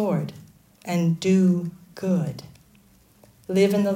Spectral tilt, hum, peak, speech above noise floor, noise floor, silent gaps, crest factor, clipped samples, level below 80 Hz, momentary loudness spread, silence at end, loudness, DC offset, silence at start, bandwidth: -7 dB/octave; none; -8 dBFS; 34 dB; -56 dBFS; none; 16 dB; under 0.1%; -62 dBFS; 18 LU; 0 s; -23 LUFS; under 0.1%; 0 s; 15.5 kHz